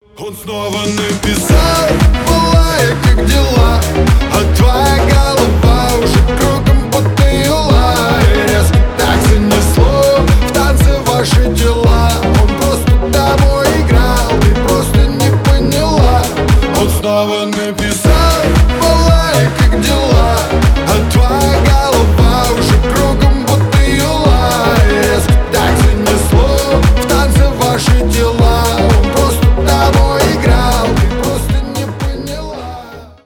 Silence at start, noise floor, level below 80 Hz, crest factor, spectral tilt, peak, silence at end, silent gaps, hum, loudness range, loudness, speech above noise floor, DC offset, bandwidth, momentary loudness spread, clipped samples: 0.2 s; -30 dBFS; -14 dBFS; 10 dB; -5.5 dB/octave; 0 dBFS; 0.15 s; none; none; 1 LU; -11 LUFS; 20 dB; under 0.1%; 18.5 kHz; 4 LU; under 0.1%